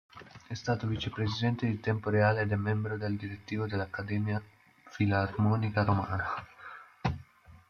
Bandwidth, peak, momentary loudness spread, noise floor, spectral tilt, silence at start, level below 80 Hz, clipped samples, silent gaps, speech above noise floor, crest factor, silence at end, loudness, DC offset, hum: 6.8 kHz; -14 dBFS; 15 LU; -55 dBFS; -7.5 dB/octave; 0.15 s; -58 dBFS; under 0.1%; none; 25 dB; 18 dB; 0.15 s; -32 LUFS; under 0.1%; none